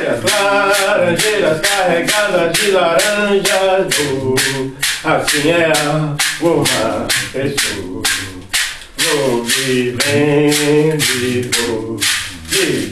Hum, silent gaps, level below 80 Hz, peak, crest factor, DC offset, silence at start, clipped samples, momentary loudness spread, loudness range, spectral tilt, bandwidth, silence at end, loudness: none; none; -42 dBFS; 0 dBFS; 14 dB; under 0.1%; 0 s; under 0.1%; 5 LU; 3 LU; -3 dB/octave; 12 kHz; 0 s; -14 LUFS